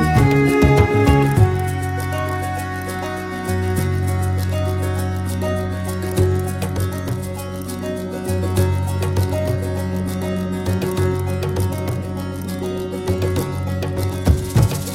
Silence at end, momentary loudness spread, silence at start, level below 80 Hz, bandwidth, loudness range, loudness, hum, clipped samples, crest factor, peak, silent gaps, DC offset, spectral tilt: 0 s; 11 LU; 0 s; -32 dBFS; 16.5 kHz; 4 LU; -20 LUFS; none; under 0.1%; 18 dB; 0 dBFS; none; under 0.1%; -6.5 dB/octave